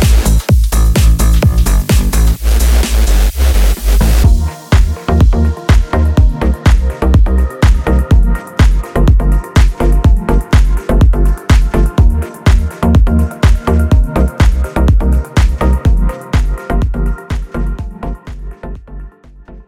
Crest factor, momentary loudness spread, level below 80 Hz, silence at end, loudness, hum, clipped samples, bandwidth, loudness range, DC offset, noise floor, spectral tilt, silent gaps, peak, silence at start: 10 dB; 9 LU; -10 dBFS; 0.05 s; -12 LUFS; none; under 0.1%; 16.5 kHz; 3 LU; under 0.1%; -35 dBFS; -6 dB/octave; none; 0 dBFS; 0 s